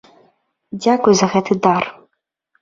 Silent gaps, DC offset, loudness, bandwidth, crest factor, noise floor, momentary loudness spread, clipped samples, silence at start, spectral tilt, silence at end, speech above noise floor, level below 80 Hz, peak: none; under 0.1%; -16 LUFS; 7.6 kHz; 18 dB; -70 dBFS; 11 LU; under 0.1%; 0.75 s; -5 dB/octave; 0.7 s; 55 dB; -58 dBFS; 0 dBFS